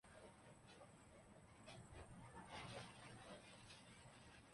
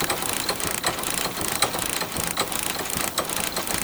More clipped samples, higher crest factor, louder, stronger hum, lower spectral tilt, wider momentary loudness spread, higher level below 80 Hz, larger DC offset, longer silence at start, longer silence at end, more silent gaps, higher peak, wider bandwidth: neither; about the same, 20 dB vs 22 dB; second, -61 LUFS vs -24 LUFS; neither; first, -4 dB/octave vs -1.5 dB/octave; first, 10 LU vs 2 LU; second, -74 dBFS vs -48 dBFS; neither; about the same, 0.05 s vs 0 s; about the same, 0 s vs 0 s; neither; second, -42 dBFS vs -4 dBFS; second, 11.5 kHz vs over 20 kHz